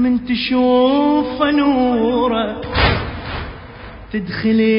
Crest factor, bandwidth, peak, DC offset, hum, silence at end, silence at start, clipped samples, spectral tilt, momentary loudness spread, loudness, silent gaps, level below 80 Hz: 14 dB; 5.4 kHz; -2 dBFS; under 0.1%; none; 0 s; 0 s; under 0.1%; -11 dB/octave; 14 LU; -16 LUFS; none; -32 dBFS